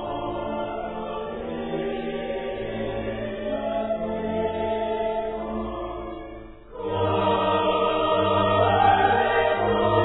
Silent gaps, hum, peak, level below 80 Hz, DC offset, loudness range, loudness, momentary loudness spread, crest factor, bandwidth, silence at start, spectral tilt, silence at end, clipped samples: none; none; -8 dBFS; -44 dBFS; under 0.1%; 8 LU; -25 LUFS; 12 LU; 16 dB; 4.1 kHz; 0 s; -9.5 dB/octave; 0 s; under 0.1%